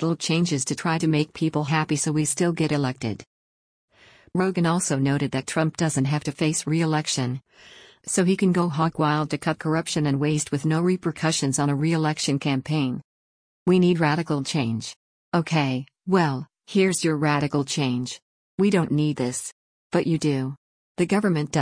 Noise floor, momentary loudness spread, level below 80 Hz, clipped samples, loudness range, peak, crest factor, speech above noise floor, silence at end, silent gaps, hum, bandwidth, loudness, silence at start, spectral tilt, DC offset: under -90 dBFS; 8 LU; -60 dBFS; under 0.1%; 2 LU; -8 dBFS; 16 dB; over 67 dB; 0 s; 3.27-3.88 s, 13.04-13.66 s, 14.96-15.32 s, 18.22-18.58 s, 19.52-19.90 s, 20.57-20.95 s; none; 10.5 kHz; -24 LUFS; 0 s; -5 dB/octave; under 0.1%